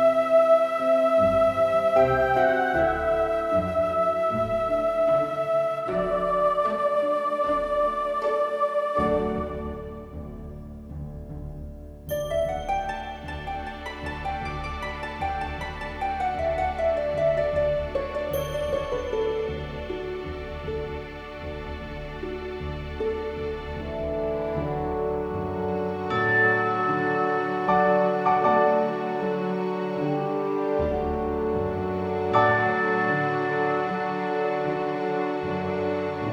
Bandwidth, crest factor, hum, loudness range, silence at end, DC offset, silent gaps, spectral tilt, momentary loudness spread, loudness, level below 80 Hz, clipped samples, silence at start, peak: 14.5 kHz; 18 dB; none; 10 LU; 0 s; under 0.1%; none; -7 dB/octave; 14 LU; -25 LUFS; -42 dBFS; under 0.1%; 0 s; -8 dBFS